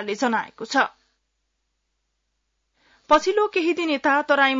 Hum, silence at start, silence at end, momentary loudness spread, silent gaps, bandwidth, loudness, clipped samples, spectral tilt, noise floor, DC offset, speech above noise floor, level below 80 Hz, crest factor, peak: none; 0 s; 0 s; 6 LU; none; 7.8 kHz; -21 LUFS; under 0.1%; -3 dB/octave; -75 dBFS; under 0.1%; 54 dB; -62 dBFS; 20 dB; -4 dBFS